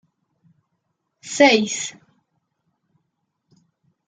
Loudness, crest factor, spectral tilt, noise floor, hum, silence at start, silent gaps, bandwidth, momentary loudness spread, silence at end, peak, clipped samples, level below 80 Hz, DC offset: -18 LUFS; 24 dB; -2.5 dB/octave; -75 dBFS; none; 1.25 s; none; 9.6 kHz; 18 LU; 2.15 s; -2 dBFS; under 0.1%; -70 dBFS; under 0.1%